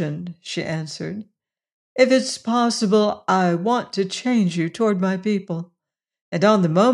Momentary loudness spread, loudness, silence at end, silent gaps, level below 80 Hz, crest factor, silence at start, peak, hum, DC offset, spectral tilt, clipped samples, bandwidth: 14 LU; -21 LUFS; 0 s; 1.72-1.96 s, 6.21-6.32 s; -68 dBFS; 18 dB; 0 s; -4 dBFS; none; under 0.1%; -5.5 dB/octave; under 0.1%; 11 kHz